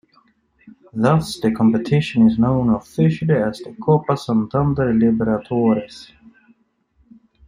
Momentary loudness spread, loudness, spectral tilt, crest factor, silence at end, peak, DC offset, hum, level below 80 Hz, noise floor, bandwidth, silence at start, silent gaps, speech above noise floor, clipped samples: 7 LU; -18 LUFS; -8 dB/octave; 18 dB; 1.45 s; -2 dBFS; under 0.1%; none; -46 dBFS; -61 dBFS; 11.5 kHz; 0.65 s; none; 44 dB; under 0.1%